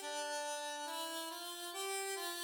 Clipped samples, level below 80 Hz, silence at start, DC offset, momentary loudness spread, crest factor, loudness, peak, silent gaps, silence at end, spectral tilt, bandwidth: under 0.1%; under -90 dBFS; 0 s; under 0.1%; 4 LU; 14 dB; -41 LUFS; -28 dBFS; none; 0 s; 2.5 dB/octave; over 20 kHz